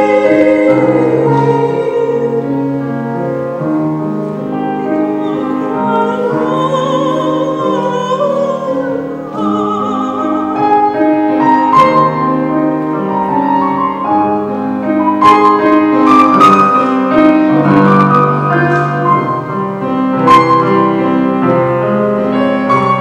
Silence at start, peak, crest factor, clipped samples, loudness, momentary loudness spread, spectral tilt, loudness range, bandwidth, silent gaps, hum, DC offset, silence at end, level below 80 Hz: 0 s; 0 dBFS; 10 dB; 0.6%; -11 LUFS; 9 LU; -7.5 dB/octave; 7 LU; 9.4 kHz; none; none; under 0.1%; 0 s; -50 dBFS